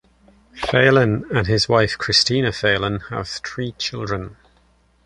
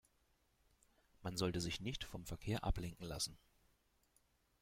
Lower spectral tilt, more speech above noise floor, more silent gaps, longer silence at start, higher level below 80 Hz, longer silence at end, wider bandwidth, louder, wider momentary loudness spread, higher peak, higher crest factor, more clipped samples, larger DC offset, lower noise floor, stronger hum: about the same, -4.5 dB/octave vs -4.5 dB/octave; first, 39 dB vs 35 dB; neither; second, 0.55 s vs 1.2 s; first, -44 dBFS vs -54 dBFS; second, 0.7 s vs 1.25 s; second, 11 kHz vs 16.5 kHz; first, -19 LUFS vs -44 LUFS; first, 13 LU vs 8 LU; first, -2 dBFS vs -24 dBFS; about the same, 18 dB vs 22 dB; neither; neither; second, -58 dBFS vs -78 dBFS; neither